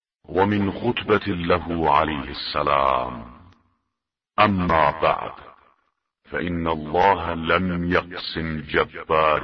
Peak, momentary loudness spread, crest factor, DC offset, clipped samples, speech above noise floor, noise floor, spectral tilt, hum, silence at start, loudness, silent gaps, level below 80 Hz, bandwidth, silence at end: -2 dBFS; 9 LU; 20 dB; under 0.1%; under 0.1%; 61 dB; -83 dBFS; -8 dB/octave; none; 0.3 s; -22 LUFS; none; -44 dBFS; 6.2 kHz; 0 s